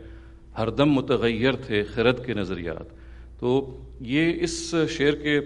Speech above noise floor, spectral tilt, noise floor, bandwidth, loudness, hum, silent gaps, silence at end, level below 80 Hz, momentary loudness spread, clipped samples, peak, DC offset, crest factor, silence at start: 20 dB; -5.5 dB/octave; -44 dBFS; 11 kHz; -24 LUFS; none; none; 0 s; -44 dBFS; 14 LU; under 0.1%; -6 dBFS; under 0.1%; 20 dB; 0 s